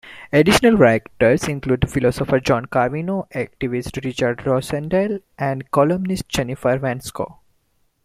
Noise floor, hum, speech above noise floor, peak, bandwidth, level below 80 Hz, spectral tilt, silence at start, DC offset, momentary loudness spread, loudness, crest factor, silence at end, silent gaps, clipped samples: -64 dBFS; none; 45 dB; -2 dBFS; 15.5 kHz; -42 dBFS; -6 dB/octave; 0.05 s; under 0.1%; 11 LU; -19 LUFS; 18 dB; 0.7 s; none; under 0.1%